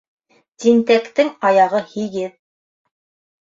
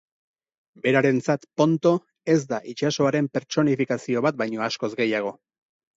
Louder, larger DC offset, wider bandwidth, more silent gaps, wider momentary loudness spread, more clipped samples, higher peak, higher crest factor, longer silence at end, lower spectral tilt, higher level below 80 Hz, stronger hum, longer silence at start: first, -17 LUFS vs -23 LUFS; neither; about the same, 7.6 kHz vs 8 kHz; neither; first, 11 LU vs 7 LU; neither; first, -2 dBFS vs -6 dBFS; about the same, 16 dB vs 18 dB; first, 1.1 s vs 0.65 s; about the same, -5 dB/octave vs -6 dB/octave; about the same, -68 dBFS vs -70 dBFS; neither; second, 0.6 s vs 0.85 s